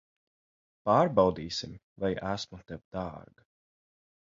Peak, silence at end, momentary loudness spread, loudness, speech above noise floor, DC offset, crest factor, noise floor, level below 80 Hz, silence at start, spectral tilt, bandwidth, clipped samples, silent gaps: -10 dBFS; 1.05 s; 18 LU; -30 LUFS; over 60 dB; under 0.1%; 24 dB; under -90 dBFS; -58 dBFS; 0.85 s; -6 dB/octave; 7.6 kHz; under 0.1%; 1.83-1.96 s, 2.85-2.91 s